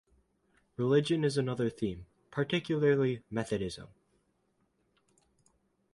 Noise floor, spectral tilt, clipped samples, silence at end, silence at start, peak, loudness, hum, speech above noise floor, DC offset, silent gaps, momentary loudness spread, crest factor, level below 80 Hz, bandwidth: -75 dBFS; -6.5 dB/octave; under 0.1%; 2.05 s; 0.8 s; -14 dBFS; -32 LUFS; none; 45 dB; under 0.1%; none; 13 LU; 20 dB; -62 dBFS; 11.5 kHz